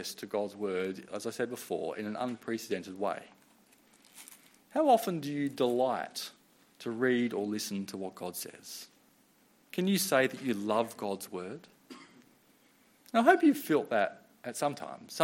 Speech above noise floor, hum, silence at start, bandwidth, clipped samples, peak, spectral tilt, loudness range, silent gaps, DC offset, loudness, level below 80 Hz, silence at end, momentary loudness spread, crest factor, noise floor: 34 dB; none; 0 s; 16.5 kHz; under 0.1%; -8 dBFS; -4.5 dB/octave; 6 LU; none; under 0.1%; -32 LUFS; -82 dBFS; 0 s; 18 LU; 24 dB; -66 dBFS